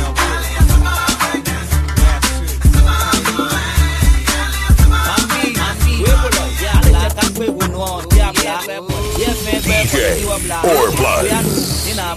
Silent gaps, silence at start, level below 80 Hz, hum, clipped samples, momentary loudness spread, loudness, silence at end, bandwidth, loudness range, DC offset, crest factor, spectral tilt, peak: none; 0 s; -16 dBFS; none; under 0.1%; 6 LU; -15 LUFS; 0 s; 15 kHz; 2 LU; under 0.1%; 14 dB; -4 dB/octave; 0 dBFS